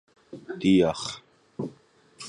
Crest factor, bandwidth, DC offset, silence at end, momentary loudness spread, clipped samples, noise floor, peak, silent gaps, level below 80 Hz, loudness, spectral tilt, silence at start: 18 dB; 11 kHz; under 0.1%; 0 s; 24 LU; under 0.1%; -57 dBFS; -10 dBFS; none; -58 dBFS; -25 LUFS; -5.5 dB/octave; 0.35 s